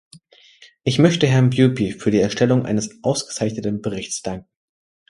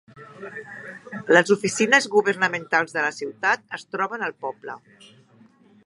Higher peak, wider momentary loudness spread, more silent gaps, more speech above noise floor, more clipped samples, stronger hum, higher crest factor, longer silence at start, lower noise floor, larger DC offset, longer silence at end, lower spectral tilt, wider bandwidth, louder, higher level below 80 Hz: about the same, 0 dBFS vs -2 dBFS; second, 11 LU vs 20 LU; neither; about the same, 31 dB vs 31 dB; neither; neither; about the same, 20 dB vs 24 dB; first, 0.85 s vs 0.15 s; second, -50 dBFS vs -54 dBFS; neither; second, 0.7 s vs 1.1 s; first, -5.5 dB/octave vs -3.5 dB/octave; about the same, 11.5 kHz vs 11.5 kHz; about the same, -19 LUFS vs -21 LUFS; first, -52 dBFS vs -74 dBFS